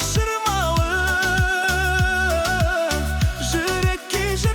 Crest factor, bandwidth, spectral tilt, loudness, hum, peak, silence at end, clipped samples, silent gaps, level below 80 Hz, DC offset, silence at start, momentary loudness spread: 12 dB; over 20 kHz; -4 dB/octave; -20 LUFS; none; -8 dBFS; 0 s; under 0.1%; none; -28 dBFS; under 0.1%; 0 s; 3 LU